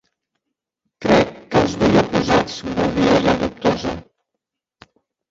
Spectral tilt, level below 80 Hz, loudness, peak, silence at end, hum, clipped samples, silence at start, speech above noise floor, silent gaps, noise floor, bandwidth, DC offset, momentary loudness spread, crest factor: -6 dB/octave; -42 dBFS; -18 LUFS; -2 dBFS; 1.3 s; none; under 0.1%; 1 s; 62 dB; none; -81 dBFS; 7.8 kHz; under 0.1%; 9 LU; 18 dB